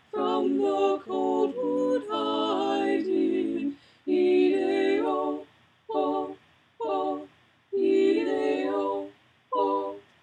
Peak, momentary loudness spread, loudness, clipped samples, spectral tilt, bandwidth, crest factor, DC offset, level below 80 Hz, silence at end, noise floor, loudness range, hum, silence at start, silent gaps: -12 dBFS; 11 LU; -27 LUFS; under 0.1%; -5.5 dB/octave; 8.8 kHz; 14 dB; under 0.1%; -76 dBFS; 0.2 s; -54 dBFS; 3 LU; none; 0.15 s; none